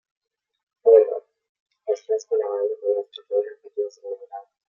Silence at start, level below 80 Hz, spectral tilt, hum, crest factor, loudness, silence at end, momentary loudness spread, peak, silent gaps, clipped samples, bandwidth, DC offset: 0.85 s; under -90 dBFS; -2.5 dB/octave; none; 22 dB; -23 LUFS; 0.3 s; 20 LU; -2 dBFS; 1.49-1.66 s; under 0.1%; 7.2 kHz; under 0.1%